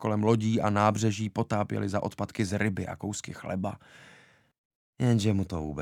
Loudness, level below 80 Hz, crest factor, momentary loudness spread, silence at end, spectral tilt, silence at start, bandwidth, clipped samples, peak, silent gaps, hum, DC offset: -29 LUFS; -56 dBFS; 20 dB; 10 LU; 0 s; -6.5 dB/octave; 0 s; 13 kHz; under 0.1%; -8 dBFS; 4.58-4.93 s; none; under 0.1%